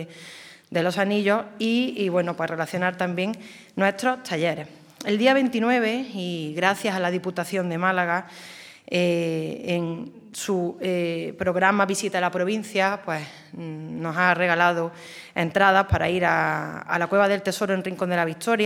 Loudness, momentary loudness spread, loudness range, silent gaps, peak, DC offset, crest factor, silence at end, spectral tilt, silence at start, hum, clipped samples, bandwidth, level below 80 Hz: -24 LUFS; 14 LU; 4 LU; none; -2 dBFS; under 0.1%; 22 dB; 0 s; -5 dB/octave; 0 s; none; under 0.1%; 18 kHz; -52 dBFS